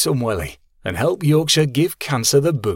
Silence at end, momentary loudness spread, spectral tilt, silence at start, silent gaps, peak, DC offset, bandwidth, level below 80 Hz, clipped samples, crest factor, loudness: 0 s; 12 LU; -4.5 dB/octave; 0 s; none; -2 dBFS; under 0.1%; 17 kHz; -44 dBFS; under 0.1%; 16 dB; -18 LUFS